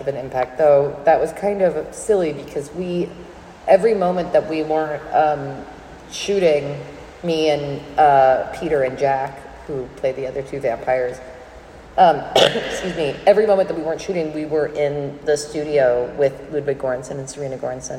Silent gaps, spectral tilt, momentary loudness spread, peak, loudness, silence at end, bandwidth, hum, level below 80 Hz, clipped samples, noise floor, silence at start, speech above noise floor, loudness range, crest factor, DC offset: none; -5 dB/octave; 14 LU; 0 dBFS; -19 LUFS; 0 s; 14.5 kHz; none; -48 dBFS; under 0.1%; -40 dBFS; 0 s; 21 dB; 3 LU; 18 dB; under 0.1%